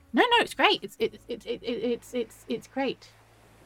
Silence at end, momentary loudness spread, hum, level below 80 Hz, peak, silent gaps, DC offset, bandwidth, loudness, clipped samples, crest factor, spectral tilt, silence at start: 0.6 s; 14 LU; none; -62 dBFS; -6 dBFS; none; under 0.1%; 17 kHz; -27 LUFS; under 0.1%; 22 dB; -3.5 dB/octave; 0.15 s